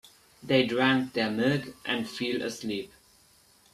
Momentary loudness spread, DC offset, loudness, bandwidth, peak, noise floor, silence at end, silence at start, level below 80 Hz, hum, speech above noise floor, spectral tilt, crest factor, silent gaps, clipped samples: 11 LU; under 0.1%; -28 LUFS; 14 kHz; -8 dBFS; -61 dBFS; 0.85 s; 0.05 s; -66 dBFS; none; 33 dB; -5 dB/octave; 22 dB; none; under 0.1%